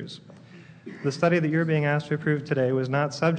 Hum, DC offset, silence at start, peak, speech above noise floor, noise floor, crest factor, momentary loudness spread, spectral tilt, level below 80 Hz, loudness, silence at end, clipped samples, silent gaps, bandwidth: none; under 0.1%; 0 s; -10 dBFS; 23 dB; -48 dBFS; 16 dB; 18 LU; -7 dB/octave; -72 dBFS; -25 LUFS; 0 s; under 0.1%; none; 9.2 kHz